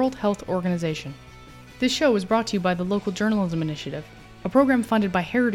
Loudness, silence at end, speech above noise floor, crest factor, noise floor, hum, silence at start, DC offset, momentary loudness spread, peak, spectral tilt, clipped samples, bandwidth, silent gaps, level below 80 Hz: -23 LUFS; 0 s; 22 dB; 18 dB; -45 dBFS; none; 0 s; under 0.1%; 14 LU; -6 dBFS; -5.5 dB/octave; under 0.1%; 16 kHz; none; -50 dBFS